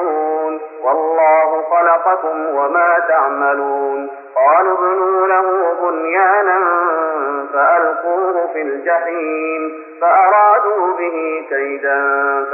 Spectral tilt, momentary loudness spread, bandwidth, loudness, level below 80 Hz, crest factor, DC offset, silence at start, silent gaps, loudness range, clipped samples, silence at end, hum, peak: -2.5 dB/octave; 8 LU; 2.9 kHz; -15 LUFS; -88 dBFS; 14 dB; under 0.1%; 0 s; none; 2 LU; under 0.1%; 0 s; none; -2 dBFS